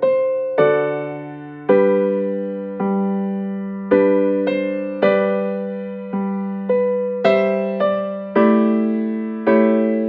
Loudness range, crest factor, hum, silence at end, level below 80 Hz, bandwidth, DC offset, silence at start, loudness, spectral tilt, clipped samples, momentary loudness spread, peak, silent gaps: 2 LU; 16 dB; none; 0 s; -64 dBFS; 5 kHz; under 0.1%; 0 s; -19 LUFS; -9.5 dB/octave; under 0.1%; 11 LU; -2 dBFS; none